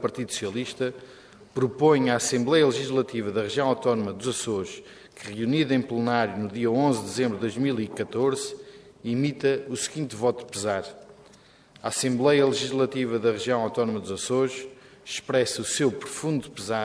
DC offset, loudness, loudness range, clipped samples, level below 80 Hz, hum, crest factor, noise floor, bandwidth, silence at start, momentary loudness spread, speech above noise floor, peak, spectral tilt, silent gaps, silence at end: under 0.1%; -26 LUFS; 4 LU; under 0.1%; -66 dBFS; none; 20 dB; -54 dBFS; 11 kHz; 0 s; 12 LU; 29 dB; -6 dBFS; -4.5 dB/octave; none; 0 s